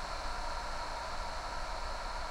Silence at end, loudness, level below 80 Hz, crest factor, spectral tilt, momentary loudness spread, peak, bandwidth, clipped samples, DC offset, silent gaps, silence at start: 0 s; -40 LUFS; -42 dBFS; 12 dB; -3 dB/octave; 1 LU; -26 dBFS; 15.5 kHz; under 0.1%; under 0.1%; none; 0 s